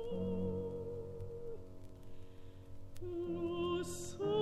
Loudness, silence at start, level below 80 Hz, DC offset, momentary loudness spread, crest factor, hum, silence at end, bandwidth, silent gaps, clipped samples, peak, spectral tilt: -42 LUFS; 0 s; -56 dBFS; under 0.1%; 19 LU; 16 dB; none; 0 s; 13.5 kHz; none; under 0.1%; -26 dBFS; -6 dB/octave